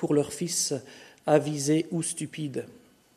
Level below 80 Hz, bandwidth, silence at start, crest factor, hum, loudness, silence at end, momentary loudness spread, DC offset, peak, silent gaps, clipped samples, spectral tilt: -70 dBFS; 13.5 kHz; 0 s; 20 dB; none; -28 LUFS; 0.4 s; 12 LU; under 0.1%; -8 dBFS; none; under 0.1%; -4.5 dB/octave